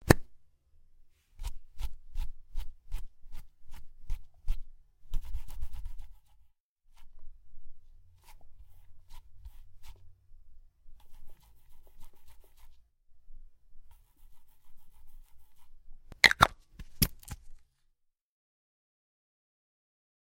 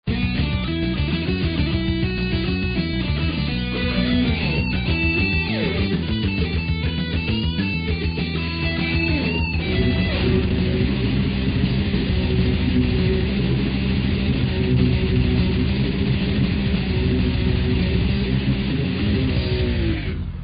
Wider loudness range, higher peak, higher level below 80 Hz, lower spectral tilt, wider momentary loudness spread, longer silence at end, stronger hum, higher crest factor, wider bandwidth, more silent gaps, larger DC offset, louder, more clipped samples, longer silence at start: first, 20 LU vs 2 LU; first, 0 dBFS vs -6 dBFS; second, -42 dBFS vs -28 dBFS; second, -3.5 dB/octave vs -5.5 dB/octave; first, 32 LU vs 3 LU; first, 2.65 s vs 0 s; neither; first, 34 dB vs 14 dB; first, 16.5 kHz vs 5.2 kHz; first, 6.60-6.76 s vs none; neither; second, -30 LUFS vs -21 LUFS; neither; about the same, 0 s vs 0.05 s